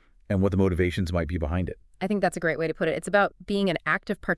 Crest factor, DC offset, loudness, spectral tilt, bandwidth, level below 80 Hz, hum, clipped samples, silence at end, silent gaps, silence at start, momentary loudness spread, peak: 18 dB; under 0.1%; -26 LUFS; -6.5 dB/octave; 12 kHz; -44 dBFS; none; under 0.1%; 0 s; none; 0.3 s; 6 LU; -8 dBFS